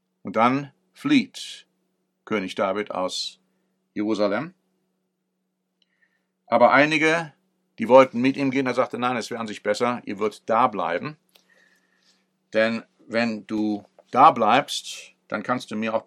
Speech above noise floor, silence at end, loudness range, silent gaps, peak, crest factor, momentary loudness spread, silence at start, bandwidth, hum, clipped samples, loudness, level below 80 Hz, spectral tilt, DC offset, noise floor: 55 dB; 0.05 s; 8 LU; none; 0 dBFS; 22 dB; 17 LU; 0.25 s; 13 kHz; none; under 0.1%; -22 LUFS; -78 dBFS; -5 dB/octave; under 0.1%; -76 dBFS